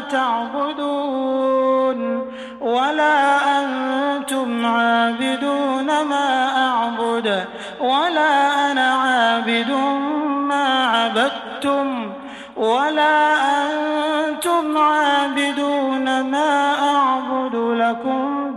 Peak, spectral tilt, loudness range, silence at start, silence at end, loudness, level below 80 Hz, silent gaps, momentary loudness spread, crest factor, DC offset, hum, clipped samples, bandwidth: -4 dBFS; -3 dB/octave; 2 LU; 0 s; 0 s; -18 LUFS; -66 dBFS; none; 6 LU; 14 dB; under 0.1%; none; under 0.1%; 13 kHz